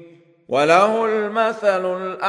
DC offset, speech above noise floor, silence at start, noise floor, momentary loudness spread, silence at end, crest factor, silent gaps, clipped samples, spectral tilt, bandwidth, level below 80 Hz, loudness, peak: under 0.1%; 28 dB; 0 s; -46 dBFS; 8 LU; 0 s; 18 dB; none; under 0.1%; -4.5 dB/octave; 10.5 kHz; -70 dBFS; -18 LUFS; -2 dBFS